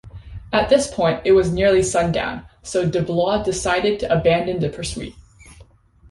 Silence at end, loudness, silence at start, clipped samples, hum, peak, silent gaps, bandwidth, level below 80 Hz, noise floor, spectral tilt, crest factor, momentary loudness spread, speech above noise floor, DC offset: 0.5 s; -19 LUFS; 0.05 s; under 0.1%; none; -2 dBFS; none; 11.5 kHz; -40 dBFS; -49 dBFS; -5 dB/octave; 16 dB; 12 LU; 30 dB; under 0.1%